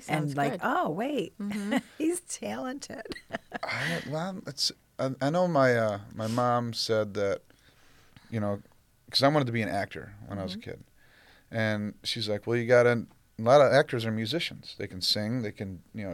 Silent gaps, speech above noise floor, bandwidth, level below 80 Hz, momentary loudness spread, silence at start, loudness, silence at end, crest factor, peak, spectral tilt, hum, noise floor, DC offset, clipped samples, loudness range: none; 30 dB; 16.5 kHz; -64 dBFS; 16 LU; 0 s; -28 LUFS; 0 s; 20 dB; -8 dBFS; -5 dB/octave; none; -59 dBFS; under 0.1%; under 0.1%; 7 LU